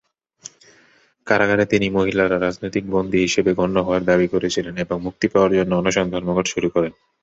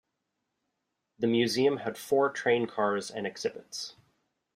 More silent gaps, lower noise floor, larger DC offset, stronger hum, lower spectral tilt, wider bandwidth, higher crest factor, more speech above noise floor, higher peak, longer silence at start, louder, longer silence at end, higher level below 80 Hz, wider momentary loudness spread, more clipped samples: neither; second, -56 dBFS vs -83 dBFS; neither; neither; about the same, -5 dB/octave vs -4.5 dB/octave; second, 8 kHz vs 15.5 kHz; about the same, 18 dB vs 18 dB; second, 37 dB vs 54 dB; first, -2 dBFS vs -12 dBFS; about the same, 1.25 s vs 1.2 s; first, -19 LUFS vs -29 LUFS; second, 0.3 s vs 0.65 s; first, -48 dBFS vs -74 dBFS; second, 8 LU vs 12 LU; neither